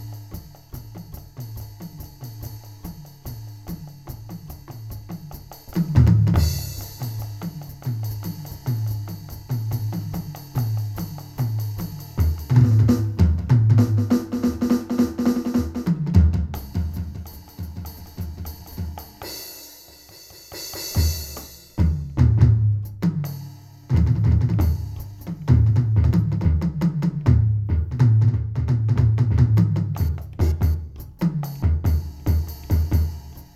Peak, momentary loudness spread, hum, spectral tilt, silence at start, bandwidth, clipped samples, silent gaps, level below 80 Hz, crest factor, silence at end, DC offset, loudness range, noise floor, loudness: -2 dBFS; 20 LU; none; -7.5 dB/octave; 0 s; 15 kHz; under 0.1%; none; -30 dBFS; 18 dB; 0.1 s; under 0.1%; 16 LU; -45 dBFS; -22 LUFS